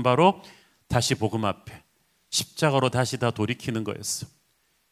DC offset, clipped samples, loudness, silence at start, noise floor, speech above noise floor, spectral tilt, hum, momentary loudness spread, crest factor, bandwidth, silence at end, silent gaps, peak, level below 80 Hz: under 0.1%; under 0.1%; -25 LUFS; 0 s; -68 dBFS; 44 dB; -4.5 dB/octave; none; 9 LU; 22 dB; 16 kHz; 0.65 s; none; -4 dBFS; -52 dBFS